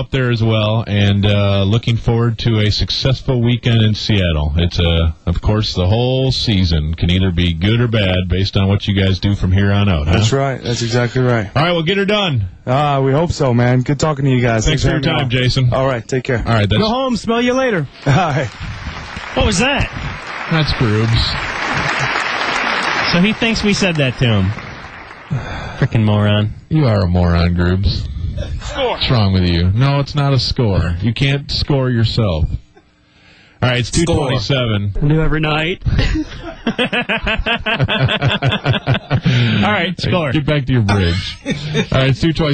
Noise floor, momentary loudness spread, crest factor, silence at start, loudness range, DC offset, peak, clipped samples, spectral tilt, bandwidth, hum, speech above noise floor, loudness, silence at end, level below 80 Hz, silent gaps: -49 dBFS; 6 LU; 12 dB; 0 s; 2 LU; under 0.1%; -2 dBFS; under 0.1%; -6 dB/octave; 9 kHz; none; 35 dB; -15 LUFS; 0 s; -28 dBFS; none